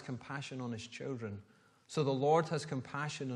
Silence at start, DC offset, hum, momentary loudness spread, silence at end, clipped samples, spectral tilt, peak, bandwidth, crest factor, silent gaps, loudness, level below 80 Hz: 0 s; under 0.1%; none; 12 LU; 0 s; under 0.1%; -6 dB/octave; -18 dBFS; 11.5 kHz; 20 dB; none; -37 LUFS; -78 dBFS